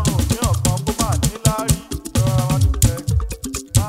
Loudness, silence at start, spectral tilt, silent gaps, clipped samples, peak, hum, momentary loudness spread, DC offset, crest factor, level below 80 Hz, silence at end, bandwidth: -19 LUFS; 0 s; -5 dB/octave; none; under 0.1%; 0 dBFS; none; 6 LU; under 0.1%; 18 dB; -26 dBFS; 0 s; 16.5 kHz